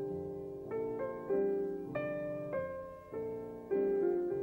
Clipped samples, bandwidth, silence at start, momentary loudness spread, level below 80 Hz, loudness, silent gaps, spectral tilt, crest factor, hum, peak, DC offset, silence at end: under 0.1%; 15.5 kHz; 0 s; 10 LU; -66 dBFS; -37 LUFS; none; -9.5 dB/octave; 14 dB; none; -24 dBFS; under 0.1%; 0 s